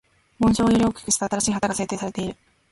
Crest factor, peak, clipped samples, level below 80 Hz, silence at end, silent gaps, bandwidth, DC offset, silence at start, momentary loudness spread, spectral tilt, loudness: 16 dB; -8 dBFS; under 0.1%; -44 dBFS; 0.4 s; none; 11.5 kHz; under 0.1%; 0.4 s; 10 LU; -4.5 dB/octave; -22 LUFS